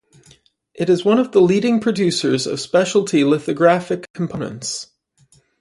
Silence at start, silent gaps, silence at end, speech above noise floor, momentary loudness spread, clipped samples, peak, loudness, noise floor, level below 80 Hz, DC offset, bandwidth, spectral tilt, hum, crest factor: 0.75 s; 4.10-4.14 s; 0.75 s; 39 dB; 11 LU; under 0.1%; -2 dBFS; -18 LUFS; -56 dBFS; -60 dBFS; under 0.1%; 11.5 kHz; -5 dB/octave; none; 16 dB